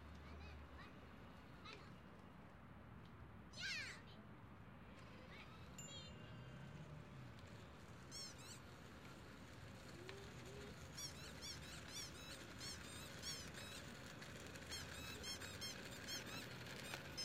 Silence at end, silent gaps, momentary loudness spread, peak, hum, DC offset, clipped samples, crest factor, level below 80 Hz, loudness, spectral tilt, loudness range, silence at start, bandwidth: 0 s; none; 11 LU; -32 dBFS; none; under 0.1%; under 0.1%; 22 dB; -68 dBFS; -54 LUFS; -3 dB/octave; 6 LU; 0 s; 16 kHz